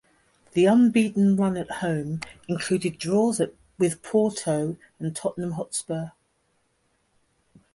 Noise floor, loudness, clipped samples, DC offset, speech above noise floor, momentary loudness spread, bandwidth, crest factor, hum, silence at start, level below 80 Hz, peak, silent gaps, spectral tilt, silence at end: -70 dBFS; -25 LUFS; under 0.1%; under 0.1%; 46 dB; 13 LU; 11.5 kHz; 16 dB; none; 0.55 s; -62 dBFS; -8 dBFS; none; -6 dB/octave; 1.65 s